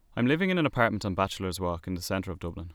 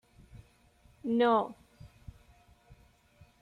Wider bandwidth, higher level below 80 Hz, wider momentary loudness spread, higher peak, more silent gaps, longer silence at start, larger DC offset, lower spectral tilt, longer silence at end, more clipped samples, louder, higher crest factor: first, 19.5 kHz vs 10.5 kHz; first, -50 dBFS vs -62 dBFS; second, 9 LU vs 28 LU; first, -8 dBFS vs -16 dBFS; neither; second, 0.15 s vs 0.35 s; neither; second, -5.5 dB/octave vs -7 dB/octave; second, 0 s vs 1.55 s; neither; about the same, -29 LUFS vs -30 LUFS; about the same, 20 dB vs 20 dB